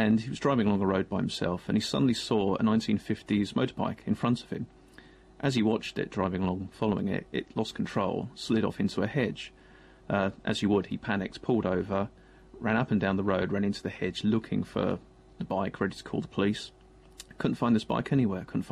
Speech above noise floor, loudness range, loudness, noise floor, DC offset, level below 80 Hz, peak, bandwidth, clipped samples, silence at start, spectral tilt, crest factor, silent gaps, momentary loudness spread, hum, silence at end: 26 dB; 3 LU; -30 LUFS; -55 dBFS; under 0.1%; -58 dBFS; -12 dBFS; 11 kHz; under 0.1%; 0 s; -6.5 dB/octave; 16 dB; none; 8 LU; none; 0 s